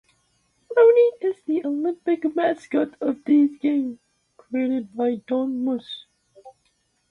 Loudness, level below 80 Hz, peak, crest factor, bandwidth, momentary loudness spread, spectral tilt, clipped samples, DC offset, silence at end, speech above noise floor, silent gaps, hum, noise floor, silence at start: -22 LUFS; -70 dBFS; -6 dBFS; 18 dB; 6.6 kHz; 11 LU; -6.5 dB/octave; under 0.1%; under 0.1%; 0.6 s; 45 dB; none; none; -68 dBFS; 0.7 s